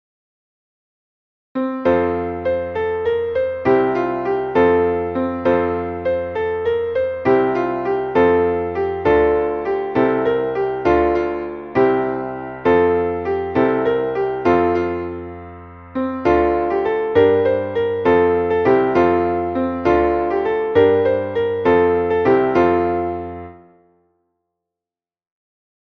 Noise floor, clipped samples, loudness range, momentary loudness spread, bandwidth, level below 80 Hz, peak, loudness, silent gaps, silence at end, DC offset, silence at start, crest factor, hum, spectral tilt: under -90 dBFS; under 0.1%; 4 LU; 8 LU; 6.2 kHz; -44 dBFS; -2 dBFS; -18 LUFS; none; 2.4 s; under 0.1%; 1.55 s; 16 dB; none; -8.5 dB/octave